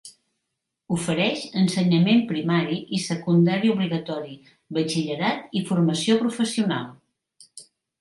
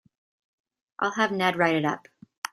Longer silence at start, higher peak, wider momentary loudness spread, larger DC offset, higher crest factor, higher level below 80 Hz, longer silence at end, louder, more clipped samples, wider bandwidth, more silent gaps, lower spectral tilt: second, 0.05 s vs 1 s; about the same, -8 dBFS vs -6 dBFS; about the same, 10 LU vs 12 LU; neither; second, 16 dB vs 22 dB; first, -66 dBFS vs -72 dBFS; first, 0.4 s vs 0.05 s; about the same, -23 LUFS vs -25 LUFS; neither; second, 11.5 kHz vs 15 kHz; second, none vs 2.38-2.42 s; about the same, -5.5 dB/octave vs -5 dB/octave